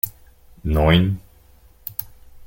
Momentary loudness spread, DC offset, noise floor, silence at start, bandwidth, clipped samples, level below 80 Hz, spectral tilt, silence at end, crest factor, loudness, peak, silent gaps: 16 LU; under 0.1%; -50 dBFS; 0.05 s; 17 kHz; under 0.1%; -32 dBFS; -6.5 dB/octave; 0.05 s; 20 dB; -21 LUFS; -2 dBFS; none